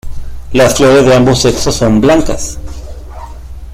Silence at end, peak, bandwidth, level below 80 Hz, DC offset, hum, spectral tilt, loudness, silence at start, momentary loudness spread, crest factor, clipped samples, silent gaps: 0 s; 0 dBFS; 16 kHz; -24 dBFS; under 0.1%; none; -5 dB/octave; -9 LUFS; 0.05 s; 23 LU; 10 dB; under 0.1%; none